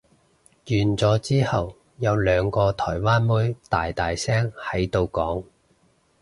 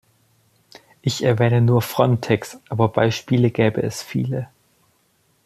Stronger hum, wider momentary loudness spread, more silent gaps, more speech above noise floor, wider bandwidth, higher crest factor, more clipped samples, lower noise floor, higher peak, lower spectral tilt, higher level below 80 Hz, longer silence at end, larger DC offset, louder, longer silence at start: neither; second, 6 LU vs 9 LU; neither; second, 40 dB vs 44 dB; second, 11.5 kHz vs 14.5 kHz; about the same, 16 dB vs 18 dB; neither; about the same, -62 dBFS vs -63 dBFS; second, -6 dBFS vs -2 dBFS; about the same, -6.5 dB/octave vs -6.5 dB/octave; first, -42 dBFS vs -56 dBFS; second, 0.8 s vs 1 s; neither; second, -23 LUFS vs -20 LUFS; second, 0.65 s vs 1.05 s